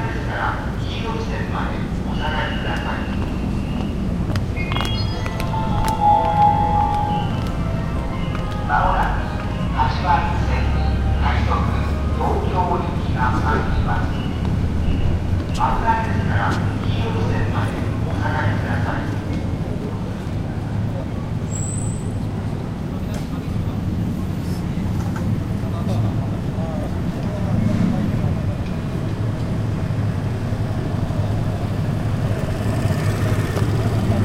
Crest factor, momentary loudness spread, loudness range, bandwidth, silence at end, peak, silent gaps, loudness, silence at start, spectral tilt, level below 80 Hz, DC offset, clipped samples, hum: 18 dB; 6 LU; 5 LU; 15 kHz; 0 s; -2 dBFS; none; -22 LUFS; 0 s; -7 dB/octave; -28 dBFS; under 0.1%; under 0.1%; none